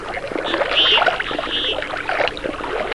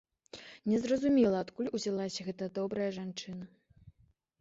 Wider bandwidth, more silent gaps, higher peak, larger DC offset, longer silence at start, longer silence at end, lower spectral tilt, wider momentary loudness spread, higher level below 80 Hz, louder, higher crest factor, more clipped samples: first, 12 kHz vs 8 kHz; neither; first, -2 dBFS vs -16 dBFS; first, 0.6% vs under 0.1%; second, 0 s vs 0.35 s; second, 0.05 s vs 0.5 s; second, -3 dB/octave vs -6 dB/octave; second, 11 LU vs 21 LU; first, -42 dBFS vs -68 dBFS; first, -18 LUFS vs -33 LUFS; about the same, 18 dB vs 18 dB; neither